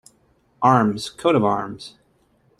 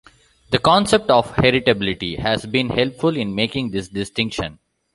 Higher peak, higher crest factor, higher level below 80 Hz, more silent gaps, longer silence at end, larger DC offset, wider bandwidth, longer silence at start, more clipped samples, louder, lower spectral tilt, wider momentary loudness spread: about the same, -2 dBFS vs -2 dBFS; about the same, 20 dB vs 18 dB; second, -58 dBFS vs -44 dBFS; neither; first, 0.7 s vs 0.4 s; neither; first, 13 kHz vs 11.5 kHz; about the same, 0.6 s vs 0.5 s; neither; about the same, -19 LUFS vs -19 LUFS; first, -6.5 dB/octave vs -5 dB/octave; first, 19 LU vs 10 LU